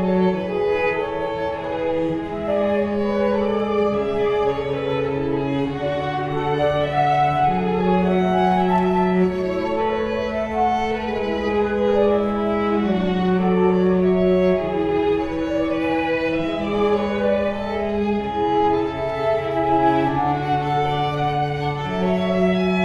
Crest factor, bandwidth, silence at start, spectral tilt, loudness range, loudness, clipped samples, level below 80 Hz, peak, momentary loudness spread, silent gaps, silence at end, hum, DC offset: 14 dB; 7.8 kHz; 0 s; -8 dB/octave; 3 LU; -20 LUFS; under 0.1%; -42 dBFS; -6 dBFS; 6 LU; none; 0 s; none; under 0.1%